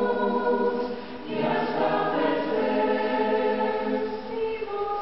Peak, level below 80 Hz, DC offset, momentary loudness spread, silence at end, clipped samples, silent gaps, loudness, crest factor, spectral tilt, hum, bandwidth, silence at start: -12 dBFS; -60 dBFS; 0.6%; 6 LU; 0 s; under 0.1%; none; -26 LUFS; 14 dB; -8 dB/octave; none; 6 kHz; 0 s